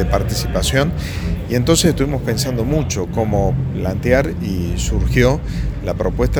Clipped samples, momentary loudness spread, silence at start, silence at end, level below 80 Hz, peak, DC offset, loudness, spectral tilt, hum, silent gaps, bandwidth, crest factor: under 0.1%; 7 LU; 0 s; 0 s; -24 dBFS; 0 dBFS; under 0.1%; -18 LUFS; -5.5 dB/octave; none; none; over 20 kHz; 16 dB